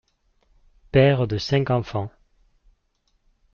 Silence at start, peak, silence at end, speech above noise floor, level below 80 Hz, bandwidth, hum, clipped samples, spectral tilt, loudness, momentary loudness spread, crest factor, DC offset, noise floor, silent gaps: 0.95 s; -4 dBFS; 1.45 s; 49 dB; -48 dBFS; 7 kHz; none; under 0.1%; -6 dB/octave; -21 LUFS; 13 LU; 20 dB; under 0.1%; -69 dBFS; none